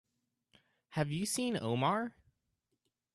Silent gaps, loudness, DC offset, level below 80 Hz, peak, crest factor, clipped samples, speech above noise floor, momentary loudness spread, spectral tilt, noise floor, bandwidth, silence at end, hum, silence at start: none; -35 LUFS; under 0.1%; -72 dBFS; -20 dBFS; 18 dB; under 0.1%; 50 dB; 8 LU; -4.5 dB/octave; -84 dBFS; 13 kHz; 1.05 s; none; 0.9 s